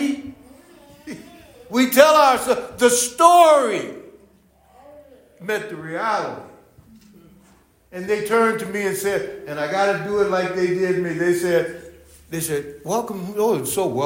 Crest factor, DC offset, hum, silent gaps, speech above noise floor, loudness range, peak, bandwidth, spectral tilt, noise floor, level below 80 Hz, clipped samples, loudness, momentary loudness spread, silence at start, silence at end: 20 dB; under 0.1%; none; none; 36 dB; 13 LU; 0 dBFS; 16.5 kHz; -3.5 dB/octave; -55 dBFS; -58 dBFS; under 0.1%; -19 LUFS; 21 LU; 0 s; 0 s